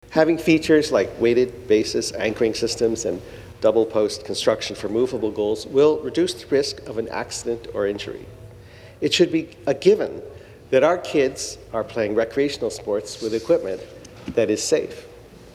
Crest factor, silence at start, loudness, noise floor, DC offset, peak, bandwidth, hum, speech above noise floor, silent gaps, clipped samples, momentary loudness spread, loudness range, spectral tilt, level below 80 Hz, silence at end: 20 dB; 0.1 s; -22 LUFS; -43 dBFS; under 0.1%; -2 dBFS; 14.5 kHz; none; 22 dB; none; under 0.1%; 12 LU; 3 LU; -4.5 dB/octave; -50 dBFS; 0.05 s